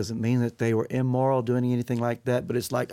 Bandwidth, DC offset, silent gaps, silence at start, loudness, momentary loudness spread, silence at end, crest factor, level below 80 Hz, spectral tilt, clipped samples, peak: 16 kHz; under 0.1%; none; 0 s; -26 LUFS; 4 LU; 0 s; 14 dB; -62 dBFS; -7 dB/octave; under 0.1%; -12 dBFS